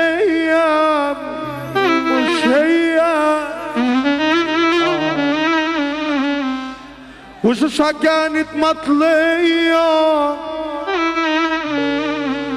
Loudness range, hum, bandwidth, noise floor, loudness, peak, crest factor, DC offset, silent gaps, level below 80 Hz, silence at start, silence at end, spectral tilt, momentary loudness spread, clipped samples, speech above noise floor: 3 LU; none; 12.5 kHz; -37 dBFS; -16 LUFS; -4 dBFS; 12 dB; under 0.1%; none; -50 dBFS; 0 s; 0 s; -4.5 dB/octave; 8 LU; under 0.1%; 23 dB